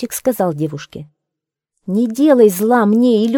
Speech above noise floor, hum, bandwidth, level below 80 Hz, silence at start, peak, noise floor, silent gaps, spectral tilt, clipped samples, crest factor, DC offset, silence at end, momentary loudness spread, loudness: 68 dB; none; 18 kHz; -58 dBFS; 0 s; 0 dBFS; -82 dBFS; none; -6 dB/octave; under 0.1%; 14 dB; under 0.1%; 0 s; 21 LU; -14 LUFS